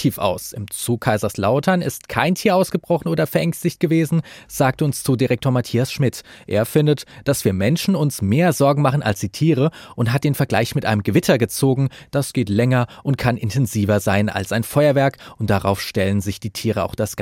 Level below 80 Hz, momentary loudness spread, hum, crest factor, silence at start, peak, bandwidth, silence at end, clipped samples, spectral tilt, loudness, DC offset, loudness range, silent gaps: -50 dBFS; 6 LU; none; 18 dB; 0 s; -2 dBFS; 16.5 kHz; 0 s; under 0.1%; -6 dB/octave; -19 LUFS; under 0.1%; 1 LU; none